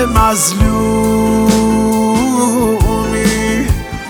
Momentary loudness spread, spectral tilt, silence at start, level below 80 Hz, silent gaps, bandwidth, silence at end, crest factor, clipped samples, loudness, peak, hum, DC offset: 3 LU; -5 dB/octave; 0 s; -22 dBFS; none; 20 kHz; 0 s; 12 dB; under 0.1%; -12 LUFS; 0 dBFS; none; under 0.1%